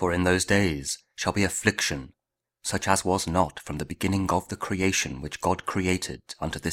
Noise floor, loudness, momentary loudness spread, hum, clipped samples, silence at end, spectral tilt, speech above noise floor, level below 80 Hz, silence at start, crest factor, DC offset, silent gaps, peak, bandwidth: -64 dBFS; -26 LUFS; 10 LU; none; under 0.1%; 0 s; -4 dB/octave; 38 dB; -48 dBFS; 0 s; 24 dB; under 0.1%; none; -2 dBFS; 16.5 kHz